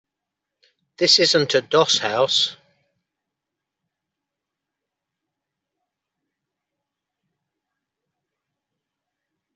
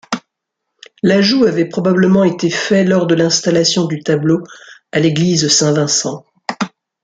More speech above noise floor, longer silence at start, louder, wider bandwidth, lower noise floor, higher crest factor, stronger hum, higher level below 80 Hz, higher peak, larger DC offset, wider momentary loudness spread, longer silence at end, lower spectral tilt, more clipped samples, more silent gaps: about the same, 66 dB vs 63 dB; first, 1 s vs 0.1 s; second, -17 LUFS vs -14 LUFS; second, 8.2 kHz vs 9.4 kHz; first, -84 dBFS vs -76 dBFS; first, 24 dB vs 14 dB; neither; second, -72 dBFS vs -56 dBFS; about the same, -2 dBFS vs 0 dBFS; neither; second, 6 LU vs 13 LU; first, 7 s vs 0.35 s; second, -2.5 dB/octave vs -4.5 dB/octave; neither; neither